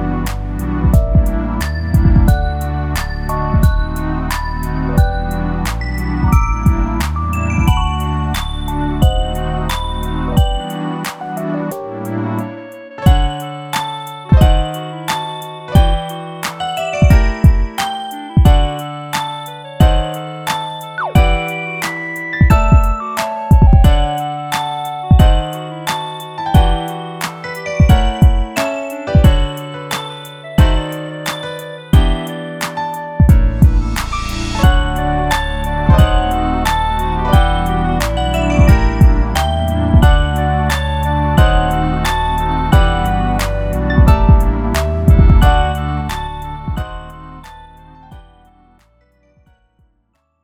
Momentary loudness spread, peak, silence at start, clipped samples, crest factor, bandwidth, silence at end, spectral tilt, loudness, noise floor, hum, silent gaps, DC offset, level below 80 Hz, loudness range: 12 LU; 0 dBFS; 0 s; under 0.1%; 14 dB; 17.5 kHz; 2.25 s; -6.5 dB/octave; -15 LUFS; -63 dBFS; none; none; under 0.1%; -16 dBFS; 5 LU